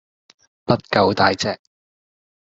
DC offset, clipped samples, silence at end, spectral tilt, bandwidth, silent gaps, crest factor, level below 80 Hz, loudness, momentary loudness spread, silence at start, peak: under 0.1%; under 0.1%; 0.85 s; -5 dB/octave; 7.8 kHz; none; 22 dB; -56 dBFS; -19 LUFS; 16 LU; 0.7 s; 0 dBFS